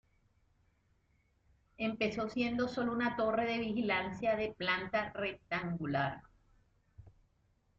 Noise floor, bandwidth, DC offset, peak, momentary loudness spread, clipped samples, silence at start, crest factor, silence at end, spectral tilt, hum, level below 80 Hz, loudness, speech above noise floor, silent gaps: -74 dBFS; 7.6 kHz; under 0.1%; -18 dBFS; 6 LU; under 0.1%; 1.8 s; 20 dB; 0.7 s; -3.5 dB/octave; none; -66 dBFS; -35 LUFS; 39 dB; none